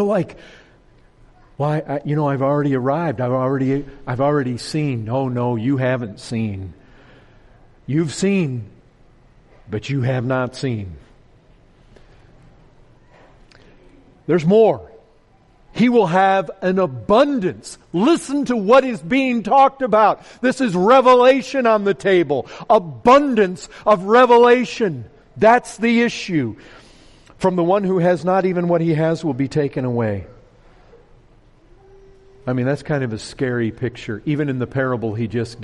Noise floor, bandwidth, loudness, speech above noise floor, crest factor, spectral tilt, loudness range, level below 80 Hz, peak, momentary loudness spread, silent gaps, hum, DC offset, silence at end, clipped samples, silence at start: -53 dBFS; 11.5 kHz; -18 LUFS; 35 dB; 16 dB; -6.5 dB/octave; 11 LU; -52 dBFS; -2 dBFS; 12 LU; none; none; under 0.1%; 0 s; under 0.1%; 0 s